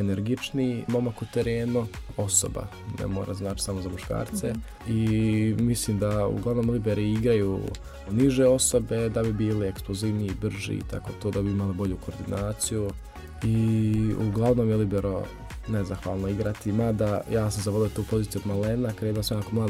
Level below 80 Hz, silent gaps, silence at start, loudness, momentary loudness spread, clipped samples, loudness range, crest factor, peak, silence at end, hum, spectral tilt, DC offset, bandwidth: -42 dBFS; none; 0 s; -27 LUFS; 9 LU; under 0.1%; 5 LU; 18 dB; -8 dBFS; 0 s; none; -6 dB/octave; under 0.1%; 15.5 kHz